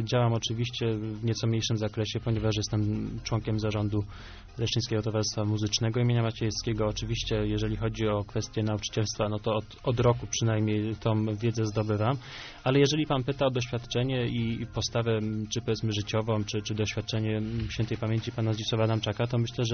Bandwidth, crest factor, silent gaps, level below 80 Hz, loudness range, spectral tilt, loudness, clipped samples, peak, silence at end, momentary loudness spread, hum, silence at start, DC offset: 6.6 kHz; 18 dB; none; -48 dBFS; 2 LU; -5.5 dB/octave; -29 LUFS; under 0.1%; -10 dBFS; 0 s; 5 LU; none; 0 s; under 0.1%